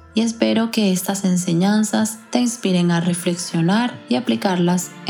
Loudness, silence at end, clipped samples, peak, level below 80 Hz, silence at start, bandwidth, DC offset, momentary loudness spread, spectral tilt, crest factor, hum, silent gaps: -19 LUFS; 0 s; under 0.1%; -2 dBFS; -64 dBFS; 0.15 s; 17.5 kHz; under 0.1%; 4 LU; -5 dB/octave; 16 dB; none; none